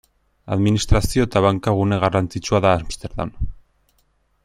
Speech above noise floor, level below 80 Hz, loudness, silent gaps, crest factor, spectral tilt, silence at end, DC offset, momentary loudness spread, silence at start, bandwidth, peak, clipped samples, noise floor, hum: 45 dB; -32 dBFS; -20 LUFS; none; 18 dB; -6 dB/octave; 0.9 s; under 0.1%; 11 LU; 0.45 s; 14.5 kHz; -2 dBFS; under 0.1%; -63 dBFS; none